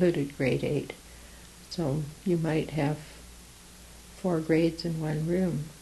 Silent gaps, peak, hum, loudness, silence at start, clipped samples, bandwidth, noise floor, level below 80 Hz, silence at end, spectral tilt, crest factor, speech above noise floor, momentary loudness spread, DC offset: none; -12 dBFS; none; -29 LUFS; 0 s; under 0.1%; 12.5 kHz; -50 dBFS; -52 dBFS; 0 s; -7 dB/octave; 18 dB; 22 dB; 22 LU; under 0.1%